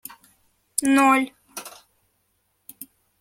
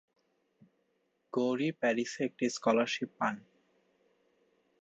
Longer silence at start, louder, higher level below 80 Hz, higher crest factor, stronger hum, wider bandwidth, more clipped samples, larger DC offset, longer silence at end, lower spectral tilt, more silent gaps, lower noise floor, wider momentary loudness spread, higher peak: second, 0.8 s vs 1.35 s; first, -20 LUFS vs -33 LUFS; first, -68 dBFS vs -82 dBFS; first, 26 dB vs 20 dB; neither; first, 16.5 kHz vs 8.2 kHz; neither; neither; second, 0.35 s vs 1.4 s; second, -2 dB/octave vs -4.5 dB/octave; neither; second, -70 dBFS vs -77 dBFS; first, 26 LU vs 6 LU; first, 0 dBFS vs -16 dBFS